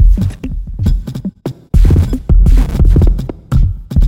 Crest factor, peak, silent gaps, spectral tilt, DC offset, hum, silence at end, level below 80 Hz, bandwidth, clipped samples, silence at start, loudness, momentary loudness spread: 10 dB; 0 dBFS; none; -8.5 dB/octave; under 0.1%; none; 0 s; -12 dBFS; 8 kHz; under 0.1%; 0 s; -14 LUFS; 13 LU